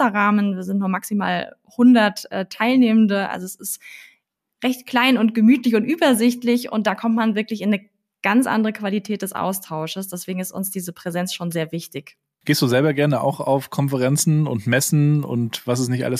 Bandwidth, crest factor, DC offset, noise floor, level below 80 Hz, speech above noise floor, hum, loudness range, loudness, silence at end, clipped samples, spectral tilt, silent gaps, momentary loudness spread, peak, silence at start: 15.5 kHz; 14 dB; under 0.1%; -64 dBFS; -70 dBFS; 45 dB; none; 6 LU; -20 LUFS; 0 s; under 0.1%; -5.5 dB/octave; none; 12 LU; -6 dBFS; 0 s